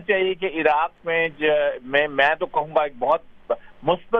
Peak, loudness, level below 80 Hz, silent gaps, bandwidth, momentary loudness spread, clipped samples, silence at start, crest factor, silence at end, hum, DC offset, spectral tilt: -4 dBFS; -22 LUFS; -54 dBFS; none; 6 kHz; 6 LU; under 0.1%; 0 s; 18 dB; 0 s; none; under 0.1%; -6.5 dB/octave